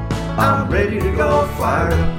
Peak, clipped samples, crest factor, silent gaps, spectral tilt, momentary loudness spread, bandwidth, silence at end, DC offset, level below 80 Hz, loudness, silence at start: -2 dBFS; under 0.1%; 14 dB; none; -7 dB/octave; 2 LU; 16.5 kHz; 0 s; under 0.1%; -26 dBFS; -17 LUFS; 0 s